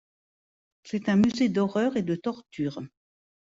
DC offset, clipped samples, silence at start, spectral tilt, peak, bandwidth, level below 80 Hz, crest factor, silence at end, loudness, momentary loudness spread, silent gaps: under 0.1%; under 0.1%; 0.85 s; -7 dB/octave; -14 dBFS; 7.8 kHz; -64 dBFS; 14 dB; 0.55 s; -27 LUFS; 12 LU; none